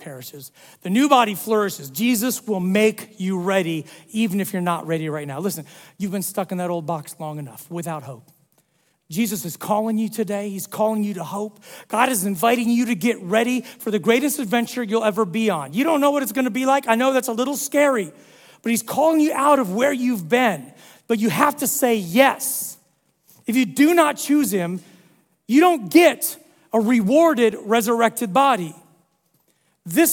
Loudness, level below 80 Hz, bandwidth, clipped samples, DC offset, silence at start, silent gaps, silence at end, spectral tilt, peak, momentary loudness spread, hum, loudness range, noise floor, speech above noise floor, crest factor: -20 LUFS; -70 dBFS; 18 kHz; under 0.1%; under 0.1%; 0 s; none; 0 s; -4.5 dB/octave; 0 dBFS; 14 LU; none; 8 LU; -65 dBFS; 45 dB; 20 dB